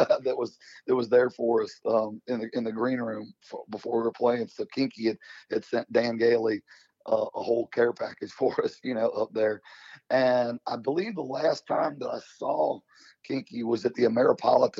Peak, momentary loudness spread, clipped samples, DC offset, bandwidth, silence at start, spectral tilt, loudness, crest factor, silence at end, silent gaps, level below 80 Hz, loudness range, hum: -8 dBFS; 12 LU; under 0.1%; under 0.1%; 7.6 kHz; 0 s; -6 dB/octave; -28 LUFS; 20 dB; 0 s; none; -76 dBFS; 2 LU; none